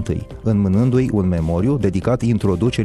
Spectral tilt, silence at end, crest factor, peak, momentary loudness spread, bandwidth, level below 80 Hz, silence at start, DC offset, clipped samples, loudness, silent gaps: -8.5 dB/octave; 0 s; 12 dB; -4 dBFS; 4 LU; 11.5 kHz; -34 dBFS; 0 s; under 0.1%; under 0.1%; -18 LUFS; none